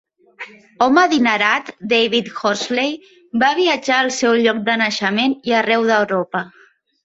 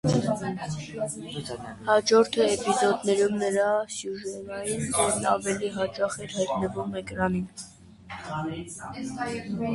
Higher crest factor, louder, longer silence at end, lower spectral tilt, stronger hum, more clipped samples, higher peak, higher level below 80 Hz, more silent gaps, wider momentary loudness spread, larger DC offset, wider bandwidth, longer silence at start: about the same, 16 dB vs 18 dB; first, -16 LUFS vs -27 LUFS; first, 0.55 s vs 0 s; about the same, -3.5 dB/octave vs -4.5 dB/octave; neither; neither; first, -2 dBFS vs -8 dBFS; second, -64 dBFS vs -56 dBFS; neither; about the same, 11 LU vs 12 LU; neither; second, 8 kHz vs 11.5 kHz; first, 0.4 s vs 0.05 s